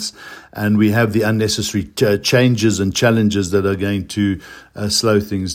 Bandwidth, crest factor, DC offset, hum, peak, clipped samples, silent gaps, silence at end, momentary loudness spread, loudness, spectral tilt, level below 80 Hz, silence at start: 16.5 kHz; 16 dB; under 0.1%; none; 0 dBFS; under 0.1%; none; 0 s; 12 LU; -16 LUFS; -5 dB/octave; -48 dBFS; 0 s